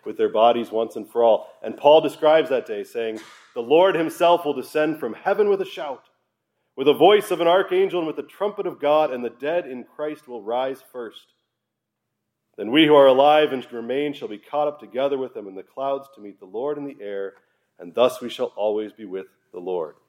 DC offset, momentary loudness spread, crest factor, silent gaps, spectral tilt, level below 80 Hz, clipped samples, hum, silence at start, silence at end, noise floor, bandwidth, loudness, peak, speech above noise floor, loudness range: under 0.1%; 18 LU; 20 dB; none; -5 dB/octave; -82 dBFS; under 0.1%; none; 0.05 s; 0.2 s; -80 dBFS; 16 kHz; -21 LUFS; -2 dBFS; 59 dB; 9 LU